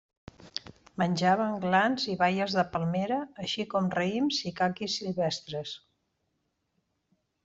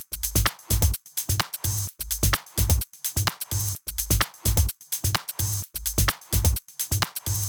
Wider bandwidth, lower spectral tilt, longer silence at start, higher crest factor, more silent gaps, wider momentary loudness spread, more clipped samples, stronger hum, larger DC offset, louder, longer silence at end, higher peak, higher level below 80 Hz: second, 7.8 kHz vs over 20 kHz; first, -5 dB/octave vs -3 dB/octave; first, 0.4 s vs 0 s; about the same, 20 dB vs 18 dB; neither; first, 15 LU vs 4 LU; neither; neither; neither; second, -29 LUFS vs -25 LUFS; first, 1.7 s vs 0 s; second, -12 dBFS vs -8 dBFS; second, -66 dBFS vs -32 dBFS